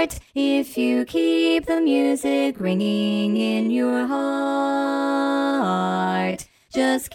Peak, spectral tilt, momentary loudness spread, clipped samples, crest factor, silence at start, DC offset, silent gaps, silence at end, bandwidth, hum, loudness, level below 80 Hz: -8 dBFS; -5.5 dB/octave; 4 LU; under 0.1%; 14 dB; 0 s; under 0.1%; none; 0 s; 17 kHz; none; -21 LUFS; -52 dBFS